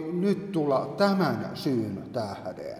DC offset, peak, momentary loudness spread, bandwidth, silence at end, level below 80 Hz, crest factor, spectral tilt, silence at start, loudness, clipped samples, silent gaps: under 0.1%; -10 dBFS; 9 LU; 15 kHz; 0 s; -66 dBFS; 18 dB; -7 dB/octave; 0 s; -28 LUFS; under 0.1%; none